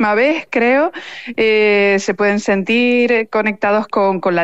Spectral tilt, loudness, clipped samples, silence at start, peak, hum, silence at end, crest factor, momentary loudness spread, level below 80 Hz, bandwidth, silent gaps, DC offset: -5 dB/octave; -14 LUFS; under 0.1%; 0 s; -4 dBFS; none; 0 s; 10 dB; 5 LU; -58 dBFS; 8.2 kHz; none; 0.4%